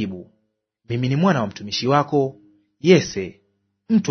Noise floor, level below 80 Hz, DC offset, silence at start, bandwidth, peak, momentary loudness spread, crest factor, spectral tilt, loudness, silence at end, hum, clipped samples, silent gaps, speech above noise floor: -71 dBFS; -60 dBFS; under 0.1%; 0 s; 6.6 kHz; 0 dBFS; 14 LU; 20 dB; -6 dB/octave; -20 LUFS; 0 s; none; under 0.1%; none; 52 dB